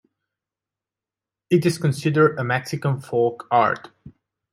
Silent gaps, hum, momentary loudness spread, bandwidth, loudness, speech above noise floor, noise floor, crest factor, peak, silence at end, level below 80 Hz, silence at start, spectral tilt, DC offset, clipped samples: none; none; 6 LU; 15.5 kHz; -21 LUFS; 68 dB; -89 dBFS; 18 dB; -6 dBFS; 0.45 s; -64 dBFS; 1.5 s; -6.5 dB/octave; under 0.1%; under 0.1%